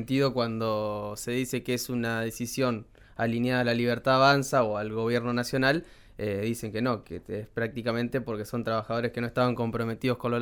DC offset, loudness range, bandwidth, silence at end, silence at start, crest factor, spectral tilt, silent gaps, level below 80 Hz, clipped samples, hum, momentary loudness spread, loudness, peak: under 0.1%; 5 LU; 19.5 kHz; 0 s; 0 s; 20 dB; -5.5 dB/octave; none; -56 dBFS; under 0.1%; none; 8 LU; -28 LUFS; -8 dBFS